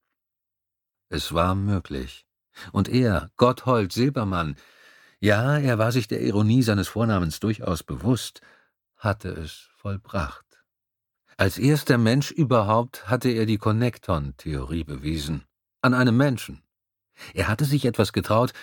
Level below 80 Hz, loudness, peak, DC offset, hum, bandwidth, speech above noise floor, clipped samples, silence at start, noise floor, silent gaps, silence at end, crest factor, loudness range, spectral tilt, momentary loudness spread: -44 dBFS; -24 LUFS; -2 dBFS; under 0.1%; none; 19 kHz; 62 dB; under 0.1%; 1.1 s; -85 dBFS; none; 0 s; 22 dB; 6 LU; -6.5 dB/octave; 14 LU